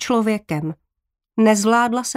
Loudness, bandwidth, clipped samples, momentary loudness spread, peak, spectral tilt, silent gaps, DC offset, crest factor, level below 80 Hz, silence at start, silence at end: -18 LUFS; 15.5 kHz; under 0.1%; 12 LU; -4 dBFS; -4.5 dB/octave; none; under 0.1%; 14 dB; -60 dBFS; 0 s; 0.05 s